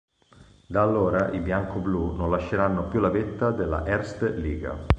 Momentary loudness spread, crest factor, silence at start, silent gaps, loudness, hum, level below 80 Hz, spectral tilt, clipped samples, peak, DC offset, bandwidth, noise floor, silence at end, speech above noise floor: 6 LU; 24 dB; 0.4 s; none; -26 LUFS; none; -36 dBFS; -8.5 dB/octave; under 0.1%; -2 dBFS; under 0.1%; 9 kHz; -54 dBFS; 0 s; 29 dB